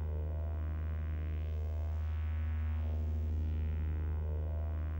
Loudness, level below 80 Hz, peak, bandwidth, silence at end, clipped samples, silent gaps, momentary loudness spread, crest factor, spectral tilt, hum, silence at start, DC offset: -38 LUFS; -38 dBFS; -28 dBFS; 3.6 kHz; 0 s; under 0.1%; none; 2 LU; 8 dB; -9.5 dB/octave; 50 Hz at -55 dBFS; 0 s; under 0.1%